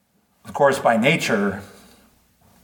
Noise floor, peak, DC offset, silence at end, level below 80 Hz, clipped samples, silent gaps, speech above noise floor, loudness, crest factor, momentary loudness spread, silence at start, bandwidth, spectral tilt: -57 dBFS; -2 dBFS; under 0.1%; 1 s; -62 dBFS; under 0.1%; none; 38 dB; -19 LUFS; 20 dB; 15 LU; 0.45 s; 19 kHz; -5 dB/octave